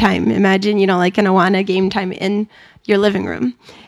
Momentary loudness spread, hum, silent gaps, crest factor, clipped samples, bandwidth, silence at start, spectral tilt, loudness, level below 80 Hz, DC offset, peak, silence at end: 9 LU; none; none; 16 dB; under 0.1%; 11.5 kHz; 0 s; -6.5 dB/octave; -16 LUFS; -50 dBFS; under 0.1%; 0 dBFS; 0.15 s